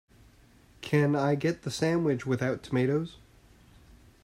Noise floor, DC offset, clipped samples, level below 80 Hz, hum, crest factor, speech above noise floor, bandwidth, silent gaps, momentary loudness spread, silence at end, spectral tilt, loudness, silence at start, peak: -58 dBFS; under 0.1%; under 0.1%; -60 dBFS; none; 18 dB; 31 dB; 14 kHz; none; 6 LU; 1.1 s; -6.5 dB/octave; -28 LUFS; 0.8 s; -12 dBFS